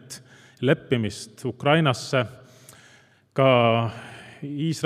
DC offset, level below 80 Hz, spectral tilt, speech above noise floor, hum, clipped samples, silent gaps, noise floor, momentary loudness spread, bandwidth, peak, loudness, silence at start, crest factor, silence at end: under 0.1%; -66 dBFS; -6 dB/octave; 33 dB; none; under 0.1%; none; -56 dBFS; 20 LU; 15 kHz; -4 dBFS; -23 LUFS; 0.1 s; 20 dB; 0 s